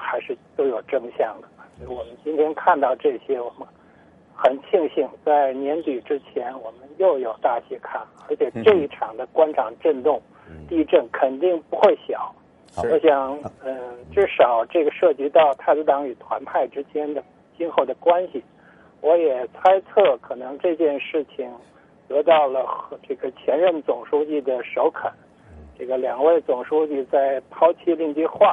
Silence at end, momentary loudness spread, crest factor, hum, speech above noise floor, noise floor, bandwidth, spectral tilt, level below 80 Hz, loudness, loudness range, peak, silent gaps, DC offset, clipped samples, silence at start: 0 s; 14 LU; 18 dB; none; 31 dB; -52 dBFS; 5.4 kHz; -6.5 dB/octave; -60 dBFS; -21 LUFS; 4 LU; -2 dBFS; none; under 0.1%; under 0.1%; 0 s